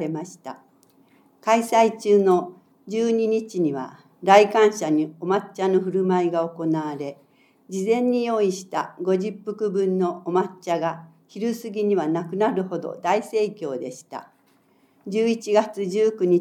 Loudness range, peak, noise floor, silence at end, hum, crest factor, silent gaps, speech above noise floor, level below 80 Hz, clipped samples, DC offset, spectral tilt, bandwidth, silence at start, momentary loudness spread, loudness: 5 LU; -2 dBFS; -61 dBFS; 0 s; none; 20 dB; none; 39 dB; -86 dBFS; under 0.1%; under 0.1%; -6 dB/octave; 14 kHz; 0 s; 15 LU; -22 LUFS